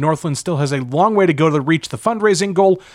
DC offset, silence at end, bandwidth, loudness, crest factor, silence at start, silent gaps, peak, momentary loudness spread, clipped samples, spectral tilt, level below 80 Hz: under 0.1%; 0.15 s; 13 kHz; -16 LUFS; 12 dB; 0 s; none; -2 dBFS; 6 LU; under 0.1%; -5.5 dB/octave; -58 dBFS